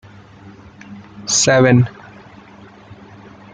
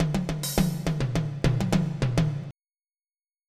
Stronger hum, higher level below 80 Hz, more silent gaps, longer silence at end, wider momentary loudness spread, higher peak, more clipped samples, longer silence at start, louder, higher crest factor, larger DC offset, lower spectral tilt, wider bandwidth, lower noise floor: neither; second, -50 dBFS vs -40 dBFS; neither; first, 1.65 s vs 0.95 s; first, 27 LU vs 4 LU; first, -2 dBFS vs -10 dBFS; neither; first, 0.9 s vs 0 s; first, -13 LUFS vs -27 LUFS; about the same, 18 dB vs 18 dB; neither; second, -4 dB/octave vs -6 dB/octave; second, 9.8 kHz vs 15 kHz; second, -42 dBFS vs under -90 dBFS